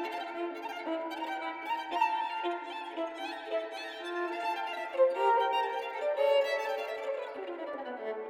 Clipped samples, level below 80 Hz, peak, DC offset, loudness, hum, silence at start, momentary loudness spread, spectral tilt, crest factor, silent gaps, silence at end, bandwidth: under 0.1%; -82 dBFS; -16 dBFS; under 0.1%; -33 LUFS; none; 0 s; 12 LU; -2 dB/octave; 18 dB; none; 0 s; 16 kHz